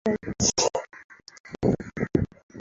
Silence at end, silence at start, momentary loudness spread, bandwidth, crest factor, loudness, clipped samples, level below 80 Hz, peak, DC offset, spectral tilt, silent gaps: 0 s; 0.05 s; 22 LU; 8.4 kHz; 22 dB; -26 LUFS; under 0.1%; -46 dBFS; -6 dBFS; under 0.1%; -4 dB/octave; 1.04-1.09 s, 1.40-1.44 s, 2.43-2.49 s